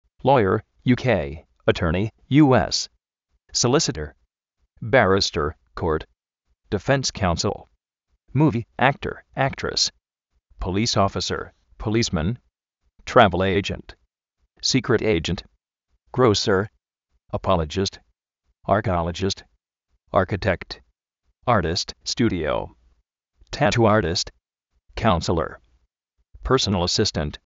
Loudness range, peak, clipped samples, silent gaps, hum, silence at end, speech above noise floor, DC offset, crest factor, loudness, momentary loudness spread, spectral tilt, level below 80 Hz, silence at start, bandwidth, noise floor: 4 LU; 0 dBFS; under 0.1%; none; none; 0.1 s; 52 dB; under 0.1%; 22 dB; -22 LUFS; 14 LU; -4.5 dB/octave; -42 dBFS; 0.25 s; 8 kHz; -73 dBFS